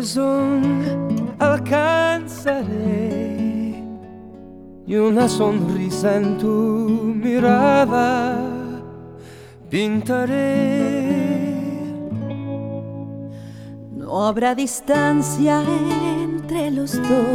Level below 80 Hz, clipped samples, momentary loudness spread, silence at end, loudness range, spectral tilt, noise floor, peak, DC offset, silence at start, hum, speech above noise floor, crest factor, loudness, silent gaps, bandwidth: -52 dBFS; under 0.1%; 17 LU; 0 s; 6 LU; -6 dB/octave; -40 dBFS; -4 dBFS; under 0.1%; 0 s; none; 22 dB; 16 dB; -20 LUFS; none; 16.5 kHz